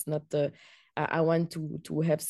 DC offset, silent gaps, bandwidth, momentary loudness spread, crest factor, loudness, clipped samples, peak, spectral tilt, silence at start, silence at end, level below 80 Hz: under 0.1%; none; 12.5 kHz; 9 LU; 18 dB; -31 LUFS; under 0.1%; -14 dBFS; -6 dB/octave; 0 s; 0 s; -68 dBFS